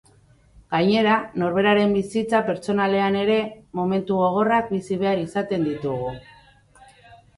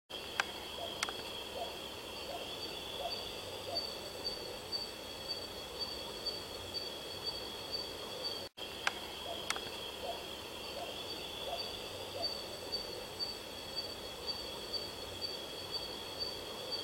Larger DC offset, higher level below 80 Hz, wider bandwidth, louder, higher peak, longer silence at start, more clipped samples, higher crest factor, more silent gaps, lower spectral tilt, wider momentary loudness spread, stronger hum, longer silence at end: neither; first, -56 dBFS vs -62 dBFS; second, 11.5 kHz vs 16.5 kHz; first, -22 LUFS vs -40 LUFS; first, -6 dBFS vs -10 dBFS; first, 0.7 s vs 0.1 s; neither; second, 16 dB vs 32 dB; neither; first, -6.5 dB/octave vs -2 dB/octave; first, 8 LU vs 4 LU; neither; first, 0.25 s vs 0 s